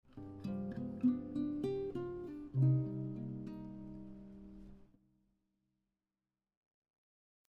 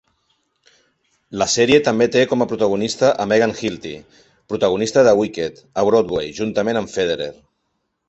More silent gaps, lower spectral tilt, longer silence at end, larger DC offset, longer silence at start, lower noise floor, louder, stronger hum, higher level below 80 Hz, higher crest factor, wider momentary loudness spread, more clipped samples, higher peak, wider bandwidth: neither; first, -11 dB/octave vs -4 dB/octave; first, 2.65 s vs 0.75 s; neither; second, 0.1 s vs 1.3 s; first, under -90 dBFS vs -72 dBFS; second, -39 LUFS vs -18 LUFS; neither; second, -66 dBFS vs -52 dBFS; about the same, 20 dB vs 18 dB; first, 20 LU vs 13 LU; neither; second, -22 dBFS vs -2 dBFS; second, 5 kHz vs 8.2 kHz